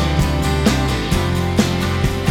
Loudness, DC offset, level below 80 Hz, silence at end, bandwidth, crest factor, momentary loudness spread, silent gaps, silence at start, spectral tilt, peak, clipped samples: -18 LUFS; under 0.1%; -24 dBFS; 0 s; 17.5 kHz; 16 dB; 2 LU; none; 0 s; -5.5 dB/octave; -2 dBFS; under 0.1%